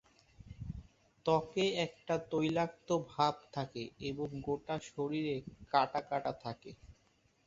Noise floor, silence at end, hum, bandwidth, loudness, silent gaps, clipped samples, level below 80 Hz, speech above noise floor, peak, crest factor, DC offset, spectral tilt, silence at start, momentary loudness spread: -72 dBFS; 0.55 s; none; 7.8 kHz; -36 LUFS; none; under 0.1%; -62 dBFS; 36 dB; -14 dBFS; 22 dB; under 0.1%; -4.5 dB/octave; 0.4 s; 15 LU